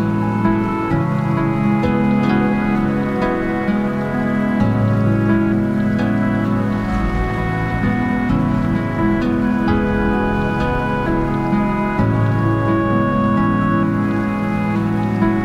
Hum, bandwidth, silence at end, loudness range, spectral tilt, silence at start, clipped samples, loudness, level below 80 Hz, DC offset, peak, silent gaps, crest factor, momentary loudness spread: none; 7.8 kHz; 0 s; 1 LU; -9 dB/octave; 0 s; under 0.1%; -17 LUFS; -32 dBFS; under 0.1%; -4 dBFS; none; 12 dB; 3 LU